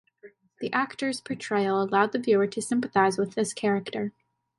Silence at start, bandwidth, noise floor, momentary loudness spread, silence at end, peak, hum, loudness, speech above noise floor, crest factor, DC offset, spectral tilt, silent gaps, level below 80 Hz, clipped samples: 0.25 s; 11.5 kHz; -54 dBFS; 10 LU; 0.5 s; -8 dBFS; none; -26 LUFS; 28 dB; 18 dB; under 0.1%; -5 dB/octave; none; -72 dBFS; under 0.1%